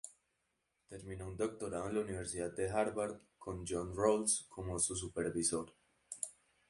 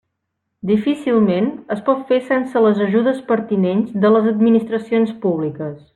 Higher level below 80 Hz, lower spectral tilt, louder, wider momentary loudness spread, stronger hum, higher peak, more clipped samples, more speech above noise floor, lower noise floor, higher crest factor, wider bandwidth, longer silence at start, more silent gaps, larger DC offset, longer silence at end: about the same, -60 dBFS vs -62 dBFS; second, -4 dB/octave vs -8.5 dB/octave; second, -38 LUFS vs -17 LUFS; first, 16 LU vs 7 LU; neither; second, -18 dBFS vs -4 dBFS; neither; second, 45 dB vs 59 dB; first, -83 dBFS vs -75 dBFS; first, 22 dB vs 14 dB; first, 11.5 kHz vs 9.4 kHz; second, 0.05 s vs 0.65 s; neither; neither; first, 0.35 s vs 0.2 s